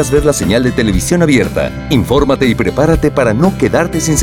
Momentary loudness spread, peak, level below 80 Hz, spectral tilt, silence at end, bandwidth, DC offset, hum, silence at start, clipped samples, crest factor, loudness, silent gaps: 3 LU; 0 dBFS; -26 dBFS; -5.5 dB/octave; 0 s; 17.5 kHz; 0.4%; none; 0 s; under 0.1%; 12 dB; -12 LUFS; none